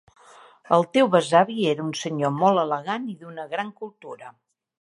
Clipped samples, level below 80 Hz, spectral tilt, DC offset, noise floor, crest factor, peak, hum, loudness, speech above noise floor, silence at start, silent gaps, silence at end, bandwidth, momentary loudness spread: under 0.1%; -74 dBFS; -5.5 dB/octave; under 0.1%; -51 dBFS; 20 dB; -2 dBFS; none; -22 LUFS; 28 dB; 0.7 s; none; 0.5 s; 11.5 kHz; 19 LU